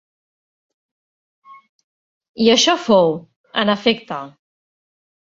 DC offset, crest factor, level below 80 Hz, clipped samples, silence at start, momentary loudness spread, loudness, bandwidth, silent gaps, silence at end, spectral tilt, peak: under 0.1%; 20 dB; -62 dBFS; under 0.1%; 2.4 s; 17 LU; -16 LUFS; 7.8 kHz; 3.36-3.44 s; 0.9 s; -3.5 dB/octave; -2 dBFS